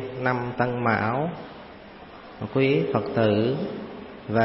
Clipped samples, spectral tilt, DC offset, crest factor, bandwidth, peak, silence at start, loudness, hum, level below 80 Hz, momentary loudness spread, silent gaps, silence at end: under 0.1%; -11 dB/octave; under 0.1%; 18 dB; 5.8 kHz; -8 dBFS; 0 s; -25 LUFS; none; -56 dBFS; 21 LU; none; 0 s